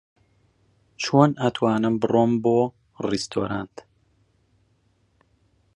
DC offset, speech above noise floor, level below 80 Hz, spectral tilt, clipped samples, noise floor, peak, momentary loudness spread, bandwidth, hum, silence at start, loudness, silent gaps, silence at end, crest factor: under 0.1%; 44 dB; -60 dBFS; -6.5 dB/octave; under 0.1%; -65 dBFS; -2 dBFS; 12 LU; 11 kHz; none; 1 s; -22 LUFS; none; 2.1 s; 24 dB